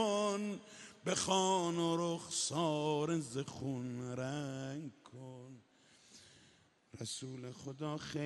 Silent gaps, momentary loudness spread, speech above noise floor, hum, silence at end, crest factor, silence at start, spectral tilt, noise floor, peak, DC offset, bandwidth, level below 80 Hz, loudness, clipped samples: none; 19 LU; 30 dB; none; 0 s; 20 dB; 0 s; -4.5 dB/octave; -68 dBFS; -20 dBFS; under 0.1%; 11.5 kHz; -76 dBFS; -38 LUFS; under 0.1%